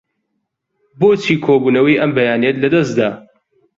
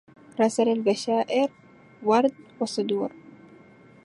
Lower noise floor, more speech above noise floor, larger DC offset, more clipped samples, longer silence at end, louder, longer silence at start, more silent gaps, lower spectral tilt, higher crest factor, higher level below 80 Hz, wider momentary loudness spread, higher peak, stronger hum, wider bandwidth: first, -72 dBFS vs -52 dBFS; first, 59 dB vs 28 dB; neither; neither; about the same, 0.6 s vs 0.7 s; first, -14 LUFS vs -25 LUFS; first, 1 s vs 0.35 s; neither; first, -6.5 dB/octave vs -5 dB/octave; about the same, 14 dB vs 18 dB; first, -56 dBFS vs -76 dBFS; second, 5 LU vs 9 LU; first, -2 dBFS vs -8 dBFS; neither; second, 7.6 kHz vs 11.5 kHz